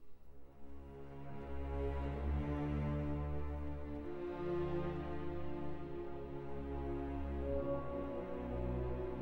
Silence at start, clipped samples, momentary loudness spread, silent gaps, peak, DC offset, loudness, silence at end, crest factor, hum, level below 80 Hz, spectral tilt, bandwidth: 0 s; under 0.1%; 10 LU; none; -28 dBFS; under 0.1%; -43 LUFS; 0 s; 14 dB; none; -46 dBFS; -9.5 dB/octave; 5.2 kHz